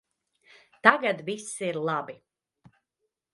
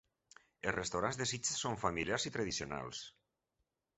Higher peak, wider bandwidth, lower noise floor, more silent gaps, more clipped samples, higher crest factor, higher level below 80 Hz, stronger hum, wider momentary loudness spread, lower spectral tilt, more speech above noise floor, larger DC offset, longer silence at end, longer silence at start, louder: first, 0 dBFS vs -16 dBFS; first, 11.5 kHz vs 8.2 kHz; second, -82 dBFS vs -86 dBFS; neither; neither; first, 30 dB vs 24 dB; second, -78 dBFS vs -62 dBFS; neither; first, 13 LU vs 8 LU; about the same, -3.5 dB/octave vs -3 dB/octave; first, 56 dB vs 47 dB; neither; first, 1.2 s vs 0.9 s; first, 0.85 s vs 0.65 s; first, -26 LUFS vs -38 LUFS